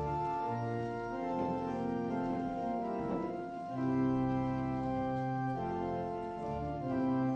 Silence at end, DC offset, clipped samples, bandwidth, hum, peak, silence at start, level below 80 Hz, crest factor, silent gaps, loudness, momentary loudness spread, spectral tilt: 0 s; under 0.1%; under 0.1%; 7.4 kHz; none; -22 dBFS; 0 s; -56 dBFS; 12 dB; none; -36 LUFS; 6 LU; -9 dB/octave